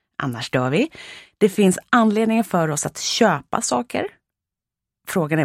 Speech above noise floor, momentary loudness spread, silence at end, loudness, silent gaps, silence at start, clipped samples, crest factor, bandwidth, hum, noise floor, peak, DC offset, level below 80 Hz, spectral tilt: 67 dB; 11 LU; 0 s; -20 LUFS; none; 0.2 s; under 0.1%; 18 dB; 16.5 kHz; none; -87 dBFS; -2 dBFS; under 0.1%; -60 dBFS; -4.5 dB/octave